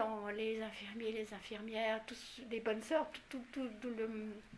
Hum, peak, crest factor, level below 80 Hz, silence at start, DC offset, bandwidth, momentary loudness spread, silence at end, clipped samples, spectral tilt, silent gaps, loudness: none; -22 dBFS; 20 dB; -70 dBFS; 0 s; under 0.1%; 11 kHz; 9 LU; 0 s; under 0.1%; -4.5 dB/octave; none; -42 LUFS